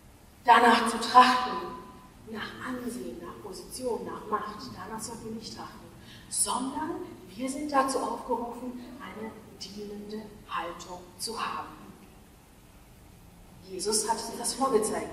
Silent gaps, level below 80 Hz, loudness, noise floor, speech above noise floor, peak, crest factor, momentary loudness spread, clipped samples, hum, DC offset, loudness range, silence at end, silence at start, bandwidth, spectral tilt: none; -58 dBFS; -28 LUFS; -54 dBFS; 25 dB; -6 dBFS; 26 dB; 21 LU; under 0.1%; none; under 0.1%; 12 LU; 0 s; 0.05 s; 15.5 kHz; -2.5 dB/octave